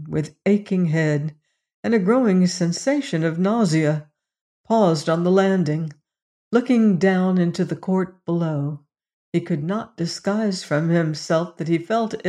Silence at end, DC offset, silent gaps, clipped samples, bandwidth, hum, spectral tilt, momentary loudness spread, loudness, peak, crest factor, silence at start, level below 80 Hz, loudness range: 0 s; under 0.1%; 1.74-1.83 s, 4.41-4.64 s, 6.22-6.51 s, 9.13-9.32 s; under 0.1%; 11 kHz; none; -6.5 dB/octave; 9 LU; -21 LUFS; -4 dBFS; 16 dB; 0 s; -64 dBFS; 4 LU